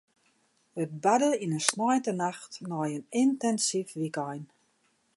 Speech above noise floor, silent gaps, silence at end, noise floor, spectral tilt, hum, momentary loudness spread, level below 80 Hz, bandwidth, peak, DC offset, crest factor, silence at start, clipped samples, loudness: 42 dB; none; 0.7 s; -71 dBFS; -4 dB/octave; none; 12 LU; -82 dBFS; 11.5 kHz; -2 dBFS; under 0.1%; 28 dB; 0.75 s; under 0.1%; -29 LUFS